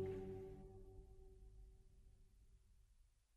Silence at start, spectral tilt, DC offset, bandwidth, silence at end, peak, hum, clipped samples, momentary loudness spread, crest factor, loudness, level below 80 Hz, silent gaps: 0 s; -8.5 dB/octave; under 0.1%; 13 kHz; 0 s; -36 dBFS; none; under 0.1%; 16 LU; 18 dB; -57 LUFS; -64 dBFS; none